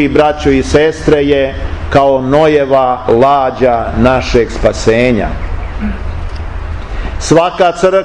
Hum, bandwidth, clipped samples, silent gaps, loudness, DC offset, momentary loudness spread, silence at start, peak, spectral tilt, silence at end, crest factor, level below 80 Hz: none; 11 kHz; 0.1%; none; -11 LUFS; 2%; 13 LU; 0 s; 0 dBFS; -6 dB/octave; 0 s; 10 dB; -22 dBFS